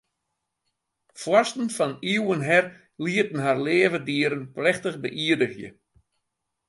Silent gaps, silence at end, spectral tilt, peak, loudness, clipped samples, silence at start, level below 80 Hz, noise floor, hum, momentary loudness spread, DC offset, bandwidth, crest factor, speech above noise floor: none; 1 s; -5 dB/octave; -6 dBFS; -24 LUFS; under 0.1%; 1.15 s; -70 dBFS; -80 dBFS; none; 10 LU; under 0.1%; 11.5 kHz; 20 dB; 56 dB